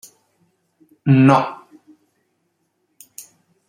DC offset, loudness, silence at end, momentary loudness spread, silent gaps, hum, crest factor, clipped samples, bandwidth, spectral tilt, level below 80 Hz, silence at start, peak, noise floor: under 0.1%; -15 LUFS; 0.5 s; 27 LU; none; none; 20 dB; under 0.1%; 16 kHz; -7.5 dB/octave; -62 dBFS; 1.05 s; -2 dBFS; -69 dBFS